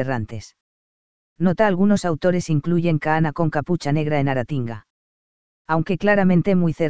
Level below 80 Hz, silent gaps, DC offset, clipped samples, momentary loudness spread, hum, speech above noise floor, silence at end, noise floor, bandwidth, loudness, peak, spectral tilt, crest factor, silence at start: -48 dBFS; 0.61-1.36 s, 4.90-5.65 s; 2%; under 0.1%; 10 LU; none; over 71 dB; 0 s; under -90 dBFS; 8 kHz; -20 LUFS; -2 dBFS; -7.5 dB/octave; 18 dB; 0 s